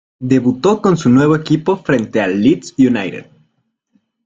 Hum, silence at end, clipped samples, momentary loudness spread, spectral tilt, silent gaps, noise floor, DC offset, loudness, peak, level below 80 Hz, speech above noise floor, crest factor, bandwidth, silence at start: none; 1.05 s; under 0.1%; 5 LU; -7 dB/octave; none; -66 dBFS; under 0.1%; -14 LUFS; 0 dBFS; -50 dBFS; 53 dB; 14 dB; 7.8 kHz; 0.2 s